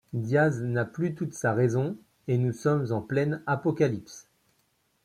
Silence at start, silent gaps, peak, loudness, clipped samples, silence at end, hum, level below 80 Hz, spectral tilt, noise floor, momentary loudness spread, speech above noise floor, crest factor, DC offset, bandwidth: 0.15 s; none; -12 dBFS; -28 LUFS; under 0.1%; 0.85 s; none; -66 dBFS; -7.5 dB/octave; -71 dBFS; 9 LU; 44 dB; 16 dB; under 0.1%; 13 kHz